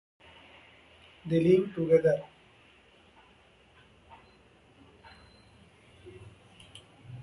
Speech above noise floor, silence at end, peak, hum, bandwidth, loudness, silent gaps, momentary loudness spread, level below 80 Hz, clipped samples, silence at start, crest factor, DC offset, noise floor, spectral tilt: 36 dB; 0 s; -12 dBFS; none; 11.5 kHz; -26 LUFS; none; 28 LU; -64 dBFS; under 0.1%; 1.25 s; 22 dB; under 0.1%; -60 dBFS; -8.5 dB/octave